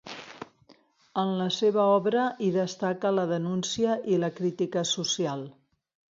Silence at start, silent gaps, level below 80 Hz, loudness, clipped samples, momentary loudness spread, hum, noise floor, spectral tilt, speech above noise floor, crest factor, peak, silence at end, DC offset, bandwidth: 0.05 s; none; -72 dBFS; -27 LUFS; under 0.1%; 18 LU; none; -60 dBFS; -4.5 dB/octave; 34 dB; 18 dB; -10 dBFS; 0.65 s; under 0.1%; 7.8 kHz